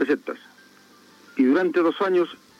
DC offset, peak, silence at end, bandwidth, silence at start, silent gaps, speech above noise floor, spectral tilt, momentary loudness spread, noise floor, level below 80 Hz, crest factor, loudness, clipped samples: under 0.1%; -10 dBFS; 0.25 s; 8.4 kHz; 0 s; none; 31 dB; -6 dB/octave; 15 LU; -53 dBFS; -80 dBFS; 14 dB; -22 LUFS; under 0.1%